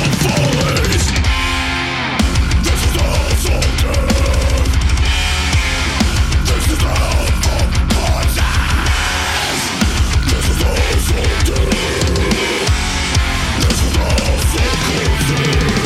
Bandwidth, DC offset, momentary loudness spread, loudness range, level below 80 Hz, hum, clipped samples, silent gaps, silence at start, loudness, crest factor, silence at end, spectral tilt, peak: 15.5 kHz; under 0.1%; 2 LU; 0 LU; -18 dBFS; none; under 0.1%; none; 0 s; -15 LUFS; 10 dB; 0 s; -4 dB/octave; -4 dBFS